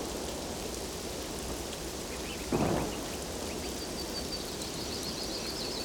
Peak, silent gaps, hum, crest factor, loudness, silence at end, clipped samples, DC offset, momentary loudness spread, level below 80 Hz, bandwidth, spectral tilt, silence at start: -16 dBFS; none; none; 20 dB; -35 LUFS; 0 s; under 0.1%; under 0.1%; 6 LU; -48 dBFS; over 20 kHz; -3.5 dB/octave; 0 s